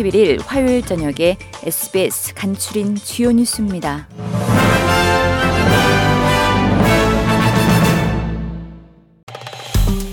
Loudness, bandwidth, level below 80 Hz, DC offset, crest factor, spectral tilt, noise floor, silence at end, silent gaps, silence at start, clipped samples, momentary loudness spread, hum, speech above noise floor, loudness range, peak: -16 LUFS; 18 kHz; -28 dBFS; under 0.1%; 14 dB; -5 dB/octave; -42 dBFS; 0 s; 9.23-9.27 s; 0 s; under 0.1%; 11 LU; none; 25 dB; 4 LU; -2 dBFS